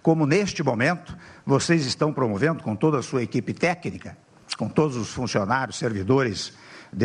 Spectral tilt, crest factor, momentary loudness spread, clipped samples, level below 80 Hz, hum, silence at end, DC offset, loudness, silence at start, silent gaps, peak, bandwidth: -5.5 dB/octave; 18 dB; 14 LU; under 0.1%; -56 dBFS; none; 0 s; under 0.1%; -24 LUFS; 0.05 s; none; -6 dBFS; 10.5 kHz